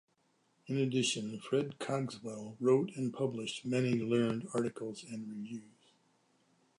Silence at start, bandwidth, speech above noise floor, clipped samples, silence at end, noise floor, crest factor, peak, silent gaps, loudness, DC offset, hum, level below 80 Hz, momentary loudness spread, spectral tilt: 0.65 s; 11 kHz; 40 dB; under 0.1%; 1.1 s; -75 dBFS; 18 dB; -18 dBFS; none; -35 LUFS; under 0.1%; none; -78 dBFS; 13 LU; -5.5 dB/octave